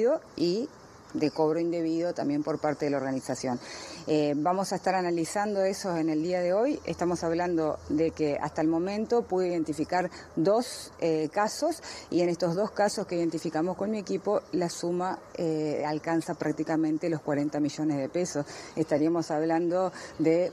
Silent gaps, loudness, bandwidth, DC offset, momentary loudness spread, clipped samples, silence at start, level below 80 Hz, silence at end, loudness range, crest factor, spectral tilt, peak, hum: none; -29 LUFS; 13 kHz; under 0.1%; 5 LU; under 0.1%; 0 s; -64 dBFS; 0 s; 2 LU; 16 dB; -5.5 dB/octave; -12 dBFS; none